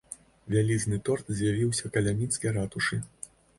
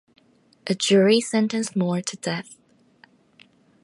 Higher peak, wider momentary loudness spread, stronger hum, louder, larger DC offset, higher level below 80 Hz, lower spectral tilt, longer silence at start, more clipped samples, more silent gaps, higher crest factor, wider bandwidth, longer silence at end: second, -12 dBFS vs -6 dBFS; first, 15 LU vs 12 LU; neither; second, -29 LUFS vs -22 LUFS; neither; first, -52 dBFS vs -74 dBFS; about the same, -5 dB/octave vs -4.5 dB/octave; second, 0.1 s vs 0.65 s; neither; neither; about the same, 18 dB vs 18 dB; about the same, 11.5 kHz vs 11.5 kHz; second, 0.3 s vs 1.3 s